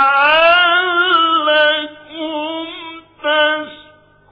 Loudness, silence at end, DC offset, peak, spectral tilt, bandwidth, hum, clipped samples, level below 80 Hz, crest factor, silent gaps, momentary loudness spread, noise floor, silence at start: -13 LUFS; 0.55 s; under 0.1%; -2 dBFS; -4.5 dB/octave; 5.2 kHz; none; under 0.1%; -54 dBFS; 12 dB; none; 18 LU; -47 dBFS; 0 s